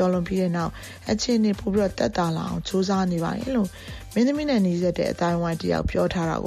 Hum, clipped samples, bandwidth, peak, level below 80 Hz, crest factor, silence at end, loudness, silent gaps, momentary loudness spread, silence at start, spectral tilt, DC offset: none; under 0.1%; 14.5 kHz; -8 dBFS; -42 dBFS; 16 dB; 0 s; -24 LUFS; none; 6 LU; 0 s; -6 dB/octave; under 0.1%